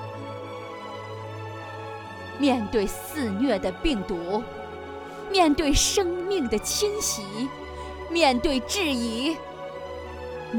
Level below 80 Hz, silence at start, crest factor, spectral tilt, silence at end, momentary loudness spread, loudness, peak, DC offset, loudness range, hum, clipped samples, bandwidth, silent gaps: -42 dBFS; 0 s; 20 dB; -3.5 dB/octave; 0 s; 16 LU; -26 LUFS; -6 dBFS; under 0.1%; 4 LU; none; under 0.1%; over 20 kHz; none